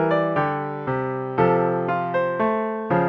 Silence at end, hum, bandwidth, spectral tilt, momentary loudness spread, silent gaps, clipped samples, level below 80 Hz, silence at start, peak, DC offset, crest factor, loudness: 0 s; none; 6 kHz; -9.5 dB/octave; 6 LU; none; under 0.1%; -56 dBFS; 0 s; -6 dBFS; under 0.1%; 16 dB; -22 LUFS